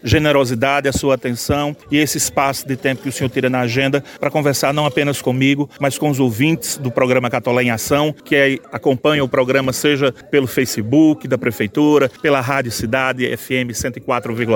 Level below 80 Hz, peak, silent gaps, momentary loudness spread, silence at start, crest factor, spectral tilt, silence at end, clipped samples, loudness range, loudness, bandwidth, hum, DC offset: -44 dBFS; -2 dBFS; none; 6 LU; 0.05 s; 16 dB; -5 dB/octave; 0 s; under 0.1%; 2 LU; -17 LUFS; 17 kHz; none; under 0.1%